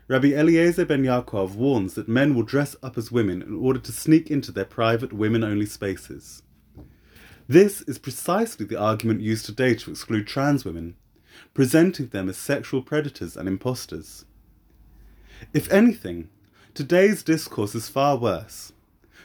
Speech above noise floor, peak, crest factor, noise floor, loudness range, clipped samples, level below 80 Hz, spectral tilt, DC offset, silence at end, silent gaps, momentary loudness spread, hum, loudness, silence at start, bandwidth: 33 dB; -2 dBFS; 20 dB; -55 dBFS; 4 LU; under 0.1%; -54 dBFS; -6 dB/octave; under 0.1%; 0.55 s; none; 15 LU; none; -23 LUFS; 0.1 s; over 20 kHz